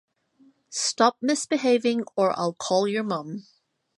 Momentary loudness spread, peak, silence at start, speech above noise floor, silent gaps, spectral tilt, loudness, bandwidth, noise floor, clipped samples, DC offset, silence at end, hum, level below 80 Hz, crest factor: 10 LU; -4 dBFS; 0.7 s; 36 dB; none; -3.5 dB/octave; -24 LUFS; 11.5 kHz; -60 dBFS; under 0.1%; under 0.1%; 0.6 s; none; -76 dBFS; 22 dB